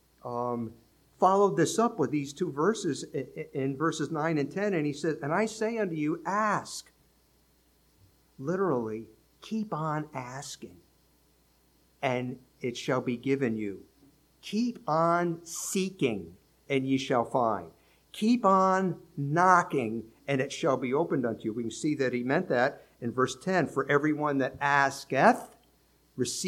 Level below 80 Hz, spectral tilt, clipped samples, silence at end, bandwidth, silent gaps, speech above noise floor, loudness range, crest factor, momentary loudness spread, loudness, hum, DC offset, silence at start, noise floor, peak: -68 dBFS; -5.5 dB/octave; under 0.1%; 0 s; 16.5 kHz; none; 37 dB; 8 LU; 22 dB; 14 LU; -29 LUFS; none; under 0.1%; 0.25 s; -66 dBFS; -8 dBFS